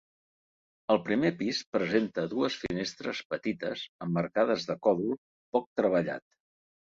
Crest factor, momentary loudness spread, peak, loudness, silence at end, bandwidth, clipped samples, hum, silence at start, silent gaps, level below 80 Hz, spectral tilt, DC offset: 22 dB; 8 LU; -10 dBFS; -30 LUFS; 0.75 s; 7.8 kHz; under 0.1%; none; 0.9 s; 1.66-1.73 s, 3.25-3.30 s, 3.89-3.99 s, 5.18-5.52 s, 5.66-5.76 s; -66 dBFS; -5.5 dB/octave; under 0.1%